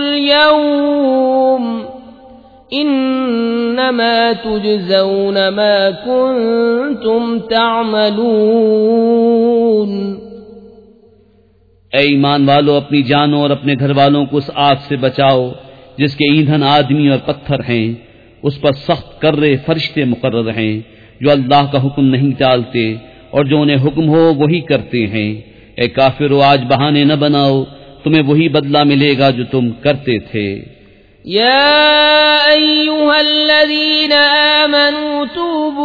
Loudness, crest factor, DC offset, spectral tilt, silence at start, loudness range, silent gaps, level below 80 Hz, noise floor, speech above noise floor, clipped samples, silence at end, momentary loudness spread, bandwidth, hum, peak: -12 LUFS; 12 dB; under 0.1%; -8 dB/octave; 0 s; 6 LU; none; -48 dBFS; -50 dBFS; 38 dB; under 0.1%; 0 s; 10 LU; 5 kHz; none; 0 dBFS